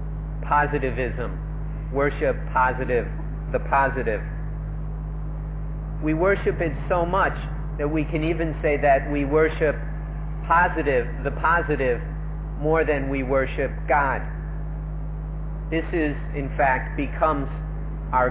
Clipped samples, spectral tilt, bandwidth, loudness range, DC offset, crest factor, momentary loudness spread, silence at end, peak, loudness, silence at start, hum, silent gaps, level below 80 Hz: under 0.1%; -11 dB/octave; 4 kHz; 4 LU; under 0.1%; 16 dB; 11 LU; 0 s; -8 dBFS; -24 LUFS; 0 s; none; none; -30 dBFS